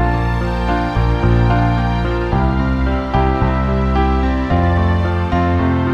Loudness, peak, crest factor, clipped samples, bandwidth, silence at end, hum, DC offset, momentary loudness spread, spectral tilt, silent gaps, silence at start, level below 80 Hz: -16 LUFS; -2 dBFS; 12 dB; under 0.1%; 7 kHz; 0 s; none; under 0.1%; 3 LU; -8.5 dB/octave; none; 0 s; -20 dBFS